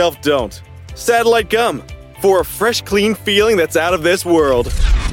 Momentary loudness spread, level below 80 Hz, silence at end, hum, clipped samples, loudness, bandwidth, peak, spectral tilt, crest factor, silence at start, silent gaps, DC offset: 8 LU; -24 dBFS; 0 s; none; under 0.1%; -15 LUFS; 17 kHz; -2 dBFS; -4 dB/octave; 14 dB; 0 s; none; under 0.1%